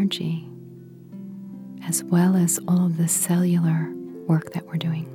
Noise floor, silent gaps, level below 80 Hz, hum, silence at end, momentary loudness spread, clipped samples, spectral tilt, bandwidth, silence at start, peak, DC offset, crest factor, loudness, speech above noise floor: -43 dBFS; none; -70 dBFS; none; 0 s; 19 LU; under 0.1%; -5.5 dB/octave; 16.5 kHz; 0 s; -8 dBFS; under 0.1%; 14 dB; -22 LUFS; 21 dB